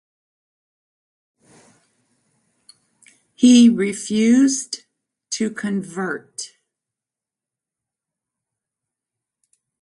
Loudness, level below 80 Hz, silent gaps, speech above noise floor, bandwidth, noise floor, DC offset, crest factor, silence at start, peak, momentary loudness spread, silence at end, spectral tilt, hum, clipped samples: -17 LUFS; -68 dBFS; none; 72 dB; 11.5 kHz; -88 dBFS; under 0.1%; 20 dB; 3.4 s; -2 dBFS; 20 LU; 3.35 s; -4 dB/octave; none; under 0.1%